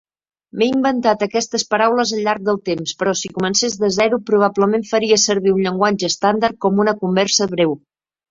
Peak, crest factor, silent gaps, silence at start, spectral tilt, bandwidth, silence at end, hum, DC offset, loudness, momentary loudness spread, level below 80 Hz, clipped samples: -2 dBFS; 16 dB; none; 0.55 s; -3.5 dB/octave; 7.8 kHz; 0.55 s; none; under 0.1%; -17 LUFS; 5 LU; -58 dBFS; under 0.1%